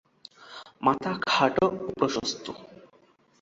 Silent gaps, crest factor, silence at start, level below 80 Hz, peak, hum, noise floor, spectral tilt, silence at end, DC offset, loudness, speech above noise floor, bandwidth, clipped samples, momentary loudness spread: none; 22 dB; 0.4 s; -64 dBFS; -6 dBFS; none; -61 dBFS; -4 dB/octave; 0.6 s; under 0.1%; -26 LUFS; 35 dB; 7.8 kHz; under 0.1%; 21 LU